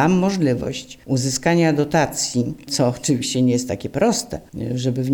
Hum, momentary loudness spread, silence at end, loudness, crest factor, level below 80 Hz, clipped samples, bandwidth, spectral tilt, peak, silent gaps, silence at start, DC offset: none; 9 LU; 0 s; -20 LUFS; 16 dB; -48 dBFS; under 0.1%; 18 kHz; -5 dB/octave; -4 dBFS; none; 0 s; under 0.1%